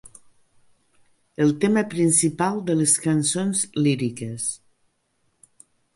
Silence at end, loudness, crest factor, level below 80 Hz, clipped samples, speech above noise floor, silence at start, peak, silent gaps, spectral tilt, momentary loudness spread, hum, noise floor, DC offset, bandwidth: 1.4 s; -21 LUFS; 18 dB; -64 dBFS; under 0.1%; 48 dB; 0.05 s; -6 dBFS; none; -4.5 dB/octave; 10 LU; none; -70 dBFS; under 0.1%; 11.5 kHz